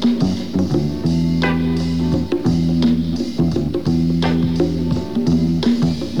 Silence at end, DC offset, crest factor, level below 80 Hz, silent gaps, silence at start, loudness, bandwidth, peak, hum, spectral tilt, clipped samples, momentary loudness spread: 0 s; 2%; 12 dB; -34 dBFS; none; 0 s; -18 LUFS; 10.5 kHz; -4 dBFS; none; -7.5 dB/octave; under 0.1%; 3 LU